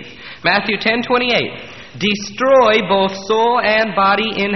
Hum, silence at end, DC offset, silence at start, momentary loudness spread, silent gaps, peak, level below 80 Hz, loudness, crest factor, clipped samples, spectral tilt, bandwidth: none; 0 s; 0.5%; 0 s; 8 LU; none; 0 dBFS; -50 dBFS; -15 LUFS; 14 dB; under 0.1%; -4.5 dB/octave; 6.2 kHz